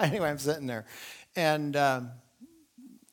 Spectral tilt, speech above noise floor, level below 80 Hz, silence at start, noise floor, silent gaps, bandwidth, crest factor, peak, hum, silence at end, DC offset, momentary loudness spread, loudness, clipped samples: -5 dB/octave; 27 dB; -68 dBFS; 0 s; -57 dBFS; none; 19.5 kHz; 24 dB; -8 dBFS; none; 0.2 s; under 0.1%; 17 LU; -30 LUFS; under 0.1%